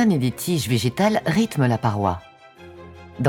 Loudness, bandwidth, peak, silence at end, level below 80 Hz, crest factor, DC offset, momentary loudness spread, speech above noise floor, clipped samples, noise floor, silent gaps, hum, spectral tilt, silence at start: -21 LUFS; 18 kHz; -4 dBFS; 0 s; -50 dBFS; 18 dB; under 0.1%; 22 LU; 24 dB; under 0.1%; -44 dBFS; none; none; -6 dB/octave; 0 s